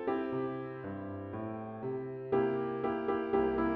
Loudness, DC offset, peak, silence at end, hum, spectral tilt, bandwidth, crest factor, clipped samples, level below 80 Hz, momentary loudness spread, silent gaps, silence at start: -35 LUFS; under 0.1%; -18 dBFS; 0 s; none; -6.5 dB/octave; 4.7 kHz; 16 dB; under 0.1%; -60 dBFS; 10 LU; none; 0 s